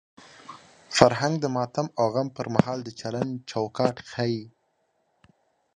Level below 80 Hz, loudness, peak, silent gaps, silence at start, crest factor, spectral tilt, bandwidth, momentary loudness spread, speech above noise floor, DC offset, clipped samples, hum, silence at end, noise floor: -58 dBFS; -26 LUFS; 0 dBFS; none; 0.5 s; 26 dB; -5.5 dB/octave; 11 kHz; 14 LU; 46 dB; under 0.1%; under 0.1%; none; 1.25 s; -72 dBFS